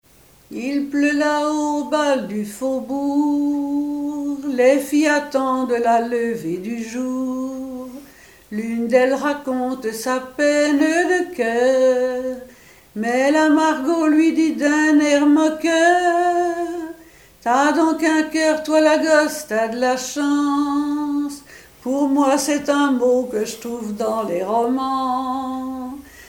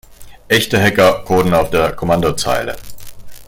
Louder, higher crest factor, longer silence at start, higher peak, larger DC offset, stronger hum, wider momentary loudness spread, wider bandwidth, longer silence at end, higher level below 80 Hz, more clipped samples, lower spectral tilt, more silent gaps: second, -19 LUFS vs -14 LUFS; about the same, 16 dB vs 14 dB; first, 0.5 s vs 0.1 s; about the same, -2 dBFS vs 0 dBFS; neither; neither; first, 12 LU vs 8 LU; about the same, 17 kHz vs 17 kHz; about the same, 0 s vs 0 s; second, -58 dBFS vs -38 dBFS; neither; about the same, -3.5 dB/octave vs -4.5 dB/octave; neither